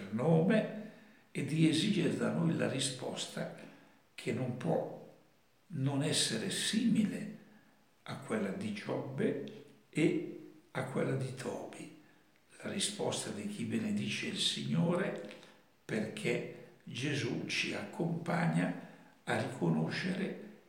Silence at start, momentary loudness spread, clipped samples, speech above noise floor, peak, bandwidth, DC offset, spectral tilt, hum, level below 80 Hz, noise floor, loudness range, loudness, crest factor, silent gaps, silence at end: 0 s; 16 LU; under 0.1%; 35 dB; -16 dBFS; 16.5 kHz; under 0.1%; -5 dB/octave; none; -82 dBFS; -69 dBFS; 4 LU; -35 LUFS; 20 dB; none; 0.1 s